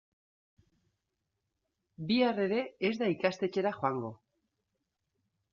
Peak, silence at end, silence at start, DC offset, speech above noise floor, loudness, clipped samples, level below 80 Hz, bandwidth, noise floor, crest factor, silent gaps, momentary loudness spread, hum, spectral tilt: -14 dBFS; 1.35 s; 2 s; under 0.1%; 53 dB; -32 LUFS; under 0.1%; -76 dBFS; 7.4 kHz; -85 dBFS; 22 dB; none; 9 LU; none; -4 dB/octave